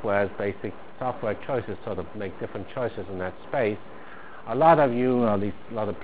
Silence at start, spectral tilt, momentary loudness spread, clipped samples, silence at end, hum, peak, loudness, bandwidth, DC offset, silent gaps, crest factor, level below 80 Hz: 0 s; -11 dB/octave; 17 LU; under 0.1%; 0 s; none; -4 dBFS; -26 LUFS; 4 kHz; 1%; none; 22 dB; -54 dBFS